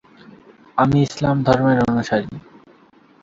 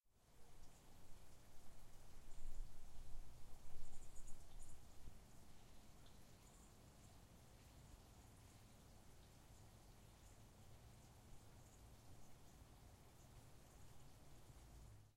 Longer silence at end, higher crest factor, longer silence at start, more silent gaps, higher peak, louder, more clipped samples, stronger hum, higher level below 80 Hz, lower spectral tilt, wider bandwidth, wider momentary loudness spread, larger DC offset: first, 0.85 s vs 0.05 s; about the same, 18 dB vs 18 dB; first, 0.75 s vs 0.05 s; neither; first, -2 dBFS vs -34 dBFS; first, -18 LUFS vs -66 LUFS; neither; neither; first, -46 dBFS vs -60 dBFS; first, -7 dB/octave vs -4.5 dB/octave; second, 7.8 kHz vs 15 kHz; first, 12 LU vs 4 LU; neither